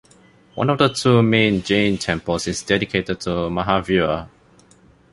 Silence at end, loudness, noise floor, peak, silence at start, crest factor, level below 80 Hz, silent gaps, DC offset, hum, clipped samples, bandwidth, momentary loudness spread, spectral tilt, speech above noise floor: 0.85 s; -19 LUFS; -52 dBFS; -2 dBFS; 0.55 s; 18 dB; -44 dBFS; none; under 0.1%; none; under 0.1%; 11.5 kHz; 8 LU; -5.5 dB/octave; 33 dB